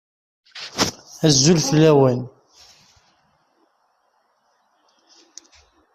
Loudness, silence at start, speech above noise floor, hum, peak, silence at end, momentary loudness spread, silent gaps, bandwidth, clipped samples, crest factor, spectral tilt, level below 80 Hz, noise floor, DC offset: -17 LUFS; 0.55 s; 50 dB; none; -2 dBFS; 3.65 s; 21 LU; none; 14.5 kHz; under 0.1%; 20 dB; -4.5 dB/octave; -54 dBFS; -65 dBFS; under 0.1%